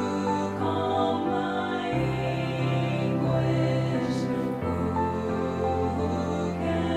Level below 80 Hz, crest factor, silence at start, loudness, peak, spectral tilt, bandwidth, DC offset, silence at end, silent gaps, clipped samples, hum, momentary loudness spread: -48 dBFS; 12 dB; 0 s; -27 LUFS; -14 dBFS; -7.5 dB/octave; 10.5 kHz; under 0.1%; 0 s; none; under 0.1%; none; 3 LU